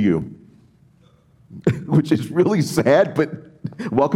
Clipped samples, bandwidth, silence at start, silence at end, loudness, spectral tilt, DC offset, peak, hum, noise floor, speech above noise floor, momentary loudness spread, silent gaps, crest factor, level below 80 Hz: under 0.1%; 16.5 kHz; 0 s; 0 s; -19 LUFS; -7 dB/octave; under 0.1%; -4 dBFS; none; -54 dBFS; 36 dB; 15 LU; none; 16 dB; -56 dBFS